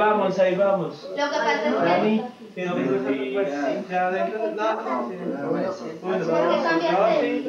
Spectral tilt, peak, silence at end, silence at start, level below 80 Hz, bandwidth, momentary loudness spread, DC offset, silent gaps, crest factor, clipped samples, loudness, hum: -6 dB/octave; -8 dBFS; 0 s; 0 s; -76 dBFS; 7.4 kHz; 8 LU; under 0.1%; none; 14 dB; under 0.1%; -23 LUFS; none